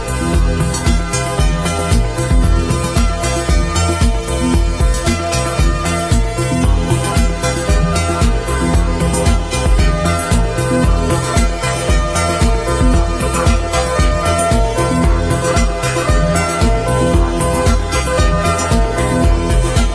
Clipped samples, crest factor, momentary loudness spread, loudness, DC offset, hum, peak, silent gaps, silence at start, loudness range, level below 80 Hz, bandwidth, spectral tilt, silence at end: under 0.1%; 12 dB; 2 LU; -15 LUFS; under 0.1%; none; -2 dBFS; none; 0 s; 1 LU; -16 dBFS; 11 kHz; -5 dB/octave; 0 s